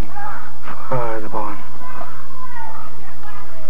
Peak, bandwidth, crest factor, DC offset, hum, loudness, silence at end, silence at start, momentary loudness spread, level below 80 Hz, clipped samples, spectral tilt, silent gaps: -2 dBFS; 16 kHz; 20 dB; 50%; none; -30 LUFS; 0 s; 0 s; 14 LU; -46 dBFS; under 0.1%; -7 dB/octave; none